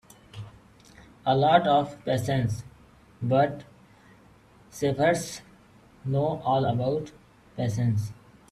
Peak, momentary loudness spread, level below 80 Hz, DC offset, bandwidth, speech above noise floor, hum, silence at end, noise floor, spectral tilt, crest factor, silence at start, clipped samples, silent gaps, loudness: -6 dBFS; 23 LU; -56 dBFS; under 0.1%; 13.5 kHz; 31 dB; none; 0.4 s; -55 dBFS; -6.5 dB/octave; 22 dB; 0.35 s; under 0.1%; none; -26 LUFS